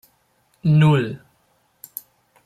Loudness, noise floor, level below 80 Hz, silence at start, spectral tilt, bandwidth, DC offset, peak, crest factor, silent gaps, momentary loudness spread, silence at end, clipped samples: -18 LUFS; -63 dBFS; -58 dBFS; 0.65 s; -7.5 dB/octave; 15 kHz; under 0.1%; -6 dBFS; 16 dB; none; 21 LU; 1.3 s; under 0.1%